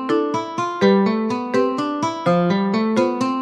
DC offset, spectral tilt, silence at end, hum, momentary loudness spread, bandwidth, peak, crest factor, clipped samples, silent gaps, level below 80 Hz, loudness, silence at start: under 0.1%; -6.5 dB/octave; 0 s; none; 6 LU; 10 kHz; -4 dBFS; 14 dB; under 0.1%; none; -66 dBFS; -19 LUFS; 0 s